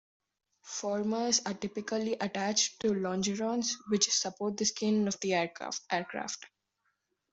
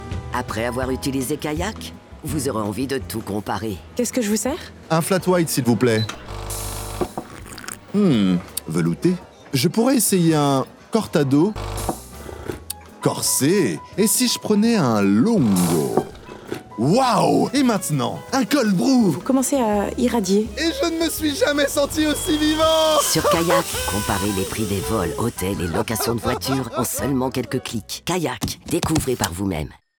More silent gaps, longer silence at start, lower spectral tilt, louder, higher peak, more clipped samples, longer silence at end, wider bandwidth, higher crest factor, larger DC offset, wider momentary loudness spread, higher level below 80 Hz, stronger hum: neither; first, 0.65 s vs 0 s; second, -3 dB/octave vs -4.5 dB/octave; second, -31 LUFS vs -20 LUFS; second, -12 dBFS vs -2 dBFS; neither; first, 0.85 s vs 0.25 s; second, 8.2 kHz vs over 20 kHz; about the same, 22 dB vs 18 dB; neither; about the same, 9 LU vs 11 LU; second, -72 dBFS vs -42 dBFS; neither